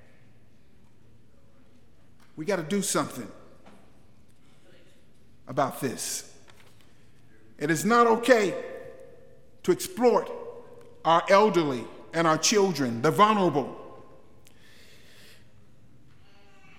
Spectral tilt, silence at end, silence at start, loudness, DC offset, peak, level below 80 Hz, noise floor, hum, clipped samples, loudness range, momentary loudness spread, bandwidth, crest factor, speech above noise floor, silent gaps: -4 dB/octave; 2.8 s; 2.35 s; -25 LUFS; 0.4%; -6 dBFS; -68 dBFS; -60 dBFS; none; under 0.1%; 12 LU; 20 LU; 16.5 kHz; 22 dB; 36 dB; none